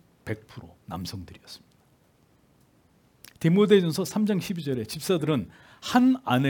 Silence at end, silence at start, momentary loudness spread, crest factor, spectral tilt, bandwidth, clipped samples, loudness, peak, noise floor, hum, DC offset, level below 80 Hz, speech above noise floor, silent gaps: 0 s; 0.25 s; 24 LU; 20 dB; -6 dB/octave; 18 kHz; under 0.1%; -25 LUFS; -6 dBFS; -62 dBFS; none; under 0.1%; -64 dBFS; 37 dB; none